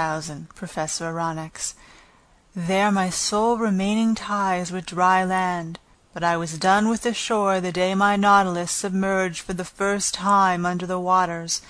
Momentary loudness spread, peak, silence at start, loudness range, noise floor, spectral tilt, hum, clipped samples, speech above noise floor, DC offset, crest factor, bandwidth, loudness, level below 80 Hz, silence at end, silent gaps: 12 LU; -4 dBFS; 0 s; 3 LU; -56 dBFS; -4 dB/octave; none; under 0.1%; 34 dB; under 0.1%; 18 dB; 11 kHz; -22 LUFS; -52 dBFS; 0 s; none